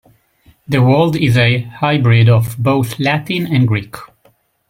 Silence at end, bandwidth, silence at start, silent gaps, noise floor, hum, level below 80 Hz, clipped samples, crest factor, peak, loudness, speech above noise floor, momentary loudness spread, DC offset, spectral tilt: 0.65 s; 16 kHz; 0.7 s; none; -55 dBFS; none; -46 dBFS; under 0.1%; 14 dB; 0 dBFS; -14 LUFS; 42 dB; 8 LU; under 0.1%; -7 dB/octave